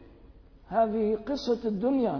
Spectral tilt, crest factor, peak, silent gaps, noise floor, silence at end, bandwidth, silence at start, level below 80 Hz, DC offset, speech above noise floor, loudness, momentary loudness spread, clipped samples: -7 dB/octave; 14 dB; -14 dBFS; none; -53 dBFS; 0 s; 5.4 kHz; 0 s; -54 dBFS; under 0.1%; 26 dB; -28 LUFS; 4 LU; under 0.1%